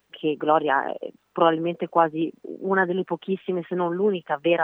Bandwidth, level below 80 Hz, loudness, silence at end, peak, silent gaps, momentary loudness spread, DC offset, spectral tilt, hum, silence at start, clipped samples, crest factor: 3.9 kHz; -84 dBFS; -24 LUFS; 0 s; -4 dBFS; none; 9 LU; under 0.1%; -8.5 dB/octave; none; 0.15 s; under 0.1%; 20 dB